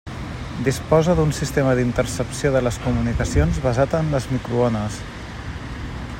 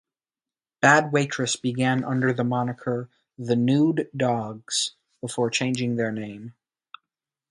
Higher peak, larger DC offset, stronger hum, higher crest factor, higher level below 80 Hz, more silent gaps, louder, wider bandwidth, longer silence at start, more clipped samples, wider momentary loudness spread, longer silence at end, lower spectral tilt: about the same, -2 dBFS vs -2 dBFS; neither; neither; second, 18 dB vs 24 dB; first, -32 dBFS vs -66 dBFS; neither; first, -21 LUFS vs -24 LUFS; first, 16.5 kHz vs 11.5 kHz; second, 0.05 s vs 0.8 s; neither; about the same, 13 LU vs 15 LU; second, 0 s vs 1 s; first, -6 dB/octave vs -4.5 dB/octave